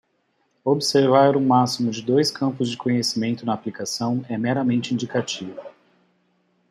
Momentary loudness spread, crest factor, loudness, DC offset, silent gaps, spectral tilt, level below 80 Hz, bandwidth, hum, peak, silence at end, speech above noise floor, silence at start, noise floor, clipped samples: 11 LU; 20 dB; -21 LUFS; under 0.1%; none; -5 dB/octave; -66 dBFS; 14 kHz; none; -4 dBFS; 1 s; 47 dB; 0.65 s; -68 dBFS; under 0.1%